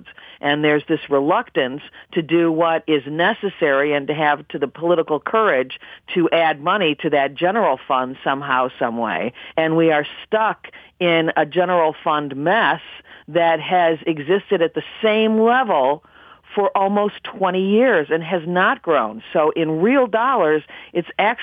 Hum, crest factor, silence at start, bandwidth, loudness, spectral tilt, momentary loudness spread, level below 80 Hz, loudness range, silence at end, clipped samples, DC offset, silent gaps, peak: none; 14 dB; 0.05 s; 4.9 kHz; -19 LUFS; -8 dB/octave; 7 LU; -64 dBFS; 2 LU; 0 s; under 0.1%; under 0.1%; none; -4 dBFS